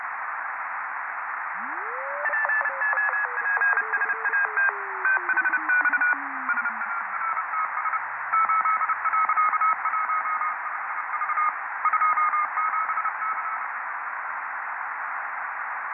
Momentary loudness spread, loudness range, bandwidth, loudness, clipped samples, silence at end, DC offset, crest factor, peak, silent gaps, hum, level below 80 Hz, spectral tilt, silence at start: 9 LU; 4 LU; 3 kHz; -25 LUFS; under 0.1%; 0 s; under 0.1%; 16 dB; -10 dBFS; none; none; under -90 dBFS; -5 dB/octave; 0 s